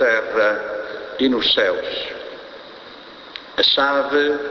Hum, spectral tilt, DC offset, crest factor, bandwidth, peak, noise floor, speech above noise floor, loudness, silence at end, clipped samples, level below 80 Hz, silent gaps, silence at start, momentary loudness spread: none; -3.5 dB/octave; under 0.1%; 16 dB; 6.6 kHz; -4 dBFS; -39 dBFS; 21 dB; -18 LUFS; 0 s; under 0.1%; -56 dBFS; none; 0 s; 22 LU